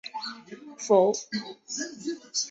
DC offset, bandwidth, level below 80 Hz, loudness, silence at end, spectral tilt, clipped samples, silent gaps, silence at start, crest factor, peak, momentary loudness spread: under 0.1%; 8.2 kHz; -76 dBFS; -28 LUFS; 0 s; -3 dB/octave; under 0.1%; none; 0.05 s; 20 dB; -8 dBFS; 17 LU